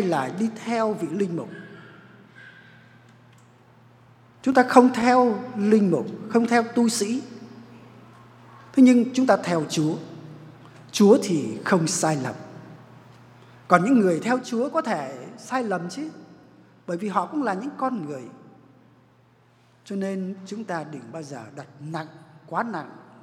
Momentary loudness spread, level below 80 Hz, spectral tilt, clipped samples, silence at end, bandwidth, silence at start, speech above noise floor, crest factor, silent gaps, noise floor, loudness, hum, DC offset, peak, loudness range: 22 LU; -72 dBFS; -5.5 dB/octave; under 0.1%; 0.25 s; 14.5 kHz; 0 s; 36 dB; 24 dB; none; -58 dBFS; -23 LUFS; none; under 0.1%; 0 dBFS; 13 LU